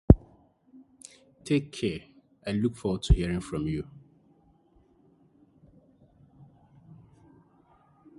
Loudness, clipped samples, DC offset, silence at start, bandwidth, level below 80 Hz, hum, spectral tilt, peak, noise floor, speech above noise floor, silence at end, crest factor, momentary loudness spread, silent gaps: -29 LUFS; under 0.1%; under 0.1%; 0.1 s; 11.5 kHz; -36 dBFS; none; -7.5 dB/octave; 0 dBFS; -63 dBFS; 35 dB; 4.35 s; 30 dB; 25 LU; none